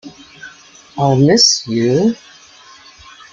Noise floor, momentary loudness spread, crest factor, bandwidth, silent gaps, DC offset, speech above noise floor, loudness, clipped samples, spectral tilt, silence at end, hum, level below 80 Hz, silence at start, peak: -42 dBFS; 27 LU; 16 dB; 11 kHz; none; under 0.1%; 30 dB; -12 LUFS; under 0.1%; -4 dB/octave; 1.2 s; none; -54 dBFS; 0.05 s; 0 dBFS